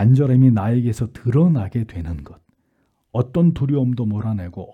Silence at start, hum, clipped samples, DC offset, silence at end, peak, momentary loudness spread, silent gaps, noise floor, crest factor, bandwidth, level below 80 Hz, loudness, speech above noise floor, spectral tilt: 0 s; none; under 0.1%; under 0.1%; 0 s; -4 dBFS; 13 LU; none; -66 dBFS; 14 dB; 8.8 kHz; -44 dBFS; -19 LUFS; 49 dB; -10 dB/octave